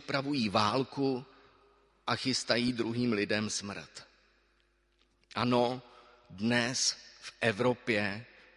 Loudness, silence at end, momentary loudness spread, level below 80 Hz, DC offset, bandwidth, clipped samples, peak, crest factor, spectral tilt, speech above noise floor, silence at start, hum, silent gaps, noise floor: -31 LUFS; 0.3 s; 14 LU; -66 dBFS; under 0.1%; 11.5 kHz; under 0.1%; -10 dBFS; 22 dB; -4 dB/octave; 40 dB; 0 s; none; none; -72 dBFS